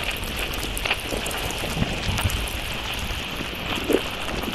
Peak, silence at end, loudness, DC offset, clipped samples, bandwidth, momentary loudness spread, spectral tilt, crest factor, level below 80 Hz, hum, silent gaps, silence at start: -4 dBFS; 0 s; -26 LUFS; under 0.1%; under 0.1%; 16 kHz; 4 LU; -3.5 dB/octave; 22 dB; -34 dBFS; none; none; 0 s